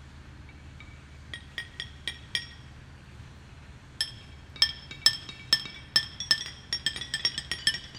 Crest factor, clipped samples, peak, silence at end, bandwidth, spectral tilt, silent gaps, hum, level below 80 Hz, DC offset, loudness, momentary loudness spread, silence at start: 30 dB; under 0.1%; -4 dBFS; 0 s; 17.5 kHz; -0.5 dB/octave; none; none; -52 dBFS; under 0.1%; -28 LUFS; 23 LU; 0 s